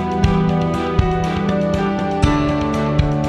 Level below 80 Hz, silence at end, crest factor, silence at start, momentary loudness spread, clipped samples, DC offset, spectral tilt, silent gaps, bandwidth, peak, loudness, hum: -28 dBFS; 0 s; 16 dB; 0 s; 3 LU; under 0.1%; under 0.1%; -7.5 dB/octave; none; 11 kHz; 0 dBFS; -18 LUFS; none